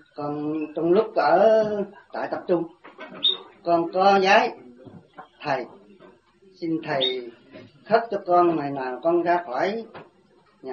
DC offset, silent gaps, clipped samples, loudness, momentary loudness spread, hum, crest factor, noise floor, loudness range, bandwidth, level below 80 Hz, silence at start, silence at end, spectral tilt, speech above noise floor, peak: under 0.1%; none; under 0.1%; -23 LUFS; 17 LU; none; 20 dB; -59 dBFS; 6 LU; 7 kHz; -70 dBFS; 0.2 s; 0 s; -5.5 dB/octave; 37 dB; -4 dBFS